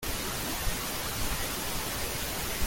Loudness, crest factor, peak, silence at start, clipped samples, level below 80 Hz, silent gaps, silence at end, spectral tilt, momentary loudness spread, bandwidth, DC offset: -32 LUFS; 16 dB; -16 dBFS; 0 s; under 0.1%; -40 dBFS; none; 0 s; -2.5 dB/octave; 1 LU; 17 kHz; under 0.1%